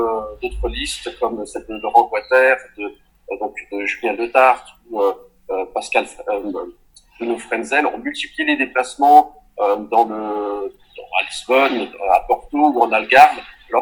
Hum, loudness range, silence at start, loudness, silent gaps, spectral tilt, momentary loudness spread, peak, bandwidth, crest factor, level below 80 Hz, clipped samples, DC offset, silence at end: none; 5 LU; 0 s; -18 LUFS; none; -3.5 dB/octave; 16 LU; 0 dBFS; 19 kHz; 18 dB; -42 dBFS; under 0.1%; under 0.1%; 0 s